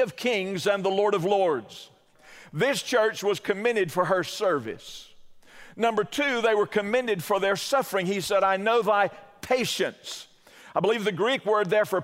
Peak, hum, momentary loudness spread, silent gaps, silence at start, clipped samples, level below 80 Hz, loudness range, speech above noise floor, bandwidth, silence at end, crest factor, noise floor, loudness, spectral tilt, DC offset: -8 dBFS; none; 12 LU; none; 0 s; under 0.1%; -68 dBFS; 2 LU; 27 dB; 16 kHz; 0 s; 18 dB; -52 dBFS; -25 LUFS; -4 dB/octave; under 0.1%